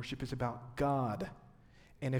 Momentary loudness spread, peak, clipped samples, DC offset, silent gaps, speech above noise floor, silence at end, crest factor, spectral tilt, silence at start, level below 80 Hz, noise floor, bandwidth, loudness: 9 LU; -22 dBFS; under 0.1%; under 0.1%; none; 24 dB; 0 s; 16 dB; -7 dB/octave; 0 s; -58 dBFS; -61 dBFS; 15.5 kHz; -38 LUFS